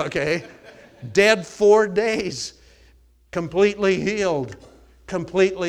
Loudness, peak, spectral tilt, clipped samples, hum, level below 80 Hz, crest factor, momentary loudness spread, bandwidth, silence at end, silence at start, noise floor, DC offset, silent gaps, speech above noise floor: -21 LUFS; -2 dBFS; -4.5 dB/octave; under 0.1%; none; -52 dBFS; 18 dB; 14 LU; 12.5 kHz; 0 s; 0 s; -54 dBFS; under 0.1%; none; 34 dB